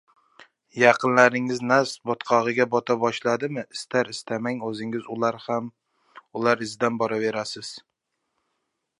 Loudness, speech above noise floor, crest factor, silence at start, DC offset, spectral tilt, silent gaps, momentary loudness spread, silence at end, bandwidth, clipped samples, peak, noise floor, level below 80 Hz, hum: -23 LUFS; 55 dB; 24 dB; 0.75 s; under 0.1%; -4.5 dB/octave; none; 14 LU; 1.2 s; 11.5 kHz; under 0.1%; -2 dBFS; -78 dBFS; -74 dBFS; none